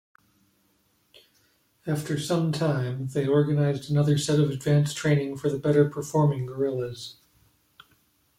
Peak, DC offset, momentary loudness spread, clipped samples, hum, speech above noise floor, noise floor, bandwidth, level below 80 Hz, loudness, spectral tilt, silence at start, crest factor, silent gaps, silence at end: -10 dBFS; under 0.1%; 9 LU; under 0.1%; none; 43 dB; -68 dBFS; 15 kHz; -62 dBFS; -25 LUFS; -6.5 dB/octave; 1.85 s; 16 dB; none; 1.25 s